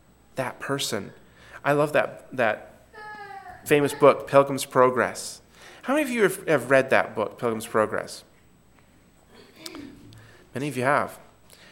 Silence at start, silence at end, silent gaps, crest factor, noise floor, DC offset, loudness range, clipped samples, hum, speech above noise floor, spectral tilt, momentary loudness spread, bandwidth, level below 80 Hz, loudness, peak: 0.35 s; 0.55 s; none; 22 dB; -56 dBFS; under 0.1%; 9 LU; under 0.1%; none; 33 dB; -4.5 dB/octave; 21 LU; 17 kHz; -64 dBFS; -24 LUFS; -2 dBFS